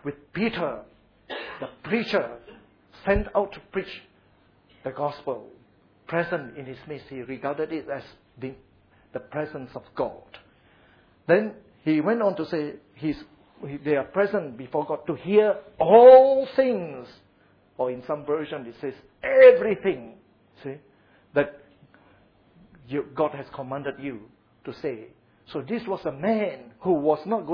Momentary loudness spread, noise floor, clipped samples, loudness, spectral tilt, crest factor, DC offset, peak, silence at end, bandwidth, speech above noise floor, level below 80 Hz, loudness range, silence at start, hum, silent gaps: 18 LU; -60 dBFS; under 0.1%; -23 LUFS; -8.5 dB/octave; 22 dB; under 0.1%; -2 dBFS; 0 s; 5.4 kHz; 37 dB; -50 dBFS; 15 LU; 0.05 s; none; none